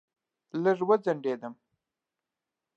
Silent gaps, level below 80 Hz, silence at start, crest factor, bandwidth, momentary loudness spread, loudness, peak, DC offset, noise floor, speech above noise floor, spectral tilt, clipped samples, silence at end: none; -88 dBFS; 0.55 s; 20 dB; 7.6 kHz; 13 LU; -28 LUFS; -10 dBFS; under 0.1%; -88 dBFS; 61 dB; -8 dB/octave; under 0.1%; 1.25 s